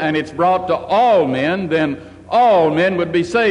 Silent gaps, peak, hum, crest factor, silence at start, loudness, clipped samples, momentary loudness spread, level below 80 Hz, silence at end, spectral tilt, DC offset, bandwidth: none; -6 dBFS; none; 10 dB; 0 s; -16 LUFS; under 0.1%; 7 LU; -48 dBFS; 0 s; -6.5 dB/octave; under 0.1%; 10.5 kHz